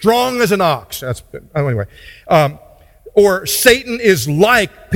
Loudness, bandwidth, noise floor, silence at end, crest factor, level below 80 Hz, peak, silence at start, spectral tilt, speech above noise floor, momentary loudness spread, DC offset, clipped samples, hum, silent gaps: -14 LUFS; 17.5 kHz; -41 dBFS; 0 s; 14 dB; -42 dBFS; 0 dBFS; 0 s; -4 dB/octave; 27 dB; 13 LU; under 0.1%; under 0.1%; none; none